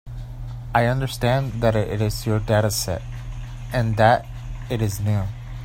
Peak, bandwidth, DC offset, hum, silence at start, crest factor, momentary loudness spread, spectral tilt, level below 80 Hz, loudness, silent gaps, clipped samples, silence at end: -2 dBFS; 16.5 kHz; under 0.1%; none; 0.05 s; 20 dB; 17 LU; -5.5 dB/octave; -36 dBFS; -22 LUFS; none; under 0.1%; 0 s